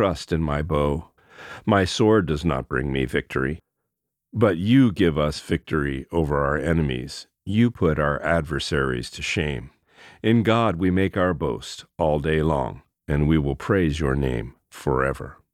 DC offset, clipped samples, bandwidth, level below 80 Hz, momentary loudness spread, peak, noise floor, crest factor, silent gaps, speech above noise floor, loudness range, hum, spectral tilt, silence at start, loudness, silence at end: under 0.1%; under 0.1%; 14 kHz; -38 dBFS; 12 LU; -4 dBFS; -81 dBFS; 18 dB; none; 59 dB; 2 LU; none; -6.5 dB/octave; 0 s; -23 LUFS; 0.2 s